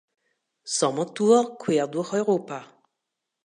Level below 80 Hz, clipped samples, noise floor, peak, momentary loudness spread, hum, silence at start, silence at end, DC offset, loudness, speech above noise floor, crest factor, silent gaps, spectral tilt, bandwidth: -78 dBFS; under 0.1%; -83 dBFS; -6 dBFS; 16 LU; none; 0.65 s; 0.8 s; under 0.1%; -24 LUFS; 60 dB; 18 dB; none; -4.5 dB/octave; 11 kHz